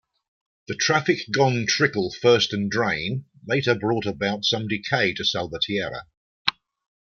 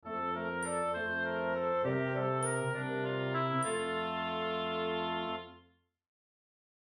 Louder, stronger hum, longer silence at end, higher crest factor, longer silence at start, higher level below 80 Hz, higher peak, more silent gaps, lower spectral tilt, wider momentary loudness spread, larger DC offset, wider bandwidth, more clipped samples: first, -23 LUFS vs -34 LUFS; neither; second, 0.65 s vs 1.25 s; first, 24 dB vs 14 dB; first, 0.7 s vs 0.05 s; first, -60 dBFS vs -74 dBFS; first, 0 dBFS vs -20 dBFS; first, 6.17-6.45 s vs none; about the same, -4 dB/octave vs -4.5 dB/octave; first, 7 LU vs 3 LU; neither; second, 7.2 kHz vs 11.5 kHz; neither